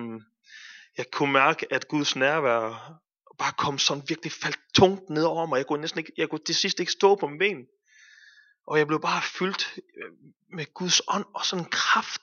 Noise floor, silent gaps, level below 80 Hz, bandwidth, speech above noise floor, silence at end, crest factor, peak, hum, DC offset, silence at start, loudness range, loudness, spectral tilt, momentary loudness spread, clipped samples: -56 dBFS; 10.36-10.40 s; -66 dBFS; 7.4 kHz; 30 dB; 0.05 s; 22 dB; -4 dBFS; none; under 0.1%; 0 s; 3 LU; -25 LUFS; -3 dB/octave; 18 LU; under 0.1%